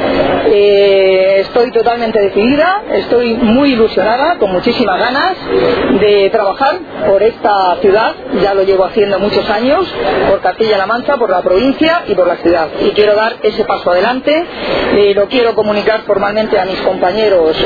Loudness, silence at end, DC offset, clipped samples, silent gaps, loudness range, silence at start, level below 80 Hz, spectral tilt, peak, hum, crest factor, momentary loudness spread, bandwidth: -11 LUFS; 0 s; under 0.1%; under 0.1%; none; 2 LU; 0 s; -38 dBFS; -7 dB/octave; 0 dBFS; none; 10 dB; 4 LU; 5 kHz